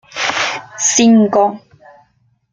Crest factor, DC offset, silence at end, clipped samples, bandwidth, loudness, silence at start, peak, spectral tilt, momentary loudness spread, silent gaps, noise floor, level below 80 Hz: 14 dB; under 0.1%; 0.95 s; under 0.1%; 9.6 kHz; -13 LUFS; 0.15 s; 0 dBFS; -3 dB/octave; 9 LU; none; -58 dBFS; -58 dBFS